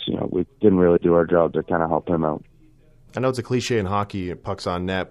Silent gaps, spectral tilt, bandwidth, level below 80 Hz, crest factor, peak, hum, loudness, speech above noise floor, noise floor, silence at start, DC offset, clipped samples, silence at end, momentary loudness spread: none; -6.5 dB/octave; 12 kHz; -48 dBFS; 18 dB; -4 dBFS; none; -21 LUFS; 31 dB; -52 dBFS; 0 s; under 0.1%; under 0.1%; 0.05 s; 11 LU